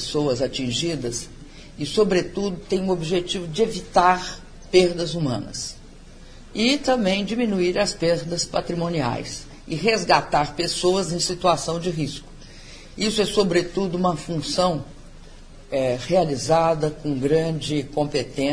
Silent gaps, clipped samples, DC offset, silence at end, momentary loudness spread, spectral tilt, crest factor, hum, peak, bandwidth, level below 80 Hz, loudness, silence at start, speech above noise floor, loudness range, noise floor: none; under 0.1%; under 0.1%; 0 s; 12 LU; -4.5 dB/octave; 20 dB; none; -2 dBFS; 10.5 kHz; -44 dBFS; -22 LUFS; 0 s; 21 dB; 2 LU; -43 dBFS